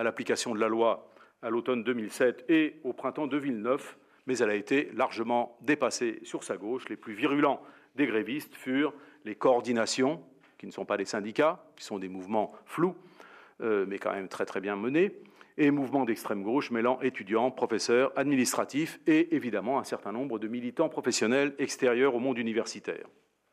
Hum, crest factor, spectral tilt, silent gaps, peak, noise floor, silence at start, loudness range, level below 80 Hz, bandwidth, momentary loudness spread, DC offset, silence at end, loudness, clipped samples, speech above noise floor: none; 18 dB; -4.5 dB/octave; none; -12 dBFS; -54 dBFS; 0 s; 4 LU; -86 dBFS; 15 kHz; 11 LU; under 0.1%; 0.5 s; -30 LUFS; under 0.1%; 25 dB